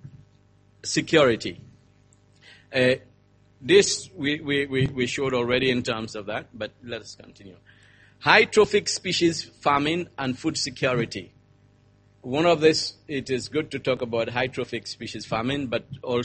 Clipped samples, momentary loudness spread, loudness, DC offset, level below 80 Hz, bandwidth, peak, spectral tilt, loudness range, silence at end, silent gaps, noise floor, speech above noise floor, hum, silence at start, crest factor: under 0.1%; 15 LU; -24 LUFS; under 0.1%; -56 dBFS; 8.8 kHz; 0 dBFS; -4 dB/octave; 5 LU; 0 s; none; -58 dBFS; 34 dB; 50 Hz at -55 dBFS; 0.05 s; 24 dB